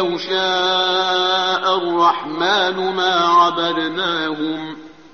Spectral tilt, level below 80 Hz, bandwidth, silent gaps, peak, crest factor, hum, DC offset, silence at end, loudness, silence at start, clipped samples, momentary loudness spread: -0.5 dB/octave; -62 dBFS; 6.8 kHz; none; -4 dBFS; 14 dB; none; 0.3%; 0.2 s; -17 LUFS; 0 s; under 0.1%; 9 LU